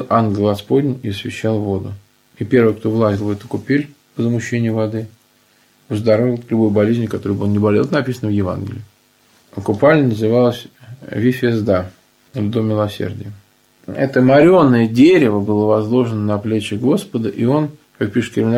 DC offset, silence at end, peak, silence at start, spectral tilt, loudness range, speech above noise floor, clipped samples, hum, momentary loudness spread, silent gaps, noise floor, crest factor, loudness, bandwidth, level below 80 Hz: under 0.1%; 0 s; 0 dBFS; 0 s; -7.5 dB/octave; 6 LU; 39 dB; under 0.1%; none; 14 LU; none; -55 dBFS; 16 dB; -16 LUFS; 15 kHz; -54 dBFS